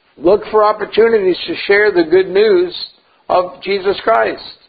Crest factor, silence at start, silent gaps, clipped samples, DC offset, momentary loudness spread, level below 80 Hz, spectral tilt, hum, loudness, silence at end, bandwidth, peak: 14 dB; 0.2 s; none; under 0.1%; under 0.1%; 8 LU; -50 dBFS; -8 dB/octave; none; -13 LUFS; 0.15 s; 5 kHz; 0 dBFS